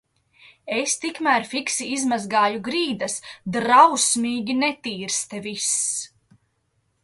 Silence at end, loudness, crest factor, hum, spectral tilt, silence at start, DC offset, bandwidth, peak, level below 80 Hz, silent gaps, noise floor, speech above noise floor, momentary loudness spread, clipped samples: 0.95 s; -21 LUFS; 22 dB; none; -2 dB/octave; 0.65 s; under 0.1%; 12 kHz; -2 dBFS; -68 dBFS; none; -70 dBFS; 48 dB; 13 LU; under 0.1%